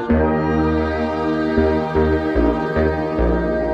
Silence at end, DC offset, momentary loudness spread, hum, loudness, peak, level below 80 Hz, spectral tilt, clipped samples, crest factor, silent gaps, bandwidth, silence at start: 0 s; under 0.1%; 3 LU; none; -19 LUFS; -4 dBFS; -26 dBFS; -9 dB/octave; under 0.1%; 14 dB; none; 7.6 kHz; 0 s